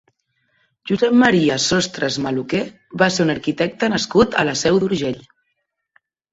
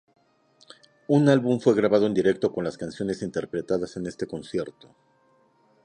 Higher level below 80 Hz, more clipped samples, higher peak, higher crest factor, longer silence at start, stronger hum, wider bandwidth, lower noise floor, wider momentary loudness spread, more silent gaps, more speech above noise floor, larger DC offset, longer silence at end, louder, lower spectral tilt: first, -50 dBFS vs -62 dBFS; neither; first, -2 dBFS vs -6 dBFS; about the same, 18 dB vs 20 dB; second, 0.85 s vs 1.1 s; neither; second, 8 kHz vs 10 kHz; first, -73 dBFS vs -63 dBFS; about the same, 10 LU vs 12 LU; neither; first, 56 dB vs 39 dB; neither; about the same, 1.1 s vs 1.15 s; first, -18 LUFS vs -25 LUFS; second, -4.5 dB/octave vs -7 dB/octave